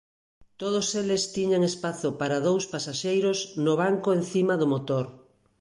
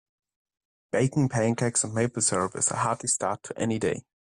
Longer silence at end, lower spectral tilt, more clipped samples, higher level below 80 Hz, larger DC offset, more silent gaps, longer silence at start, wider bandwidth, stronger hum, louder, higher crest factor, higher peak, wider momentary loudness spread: first, 0.45 s vs 0.25 s; about the same, -5 dB/octave vs -4.5 dB/octave; neither; second, -68 dBFS vs -62 dBFS; neither; neither; second, 0.6 s vs 0.95 s; about the same, 11.5 kHz vs 11.5 kHz; neither; about the same, -26 LUFS vs -26 LUFS; about the same, 14 dB vs 16 dB; about the same, -12 dBFS vs -12 dBFS; about the same, 6 LU vs 6 LU